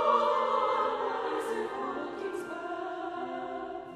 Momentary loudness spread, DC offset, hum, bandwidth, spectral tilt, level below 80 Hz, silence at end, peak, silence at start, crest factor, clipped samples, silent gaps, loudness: 10 LU; under 0.1%; none; 13.5 kHz; -4 dB/octave; -70 dBFS; 0 s; -12 dBFS; 0 s; 18 dB; under 0.1%; none; -32 LUFS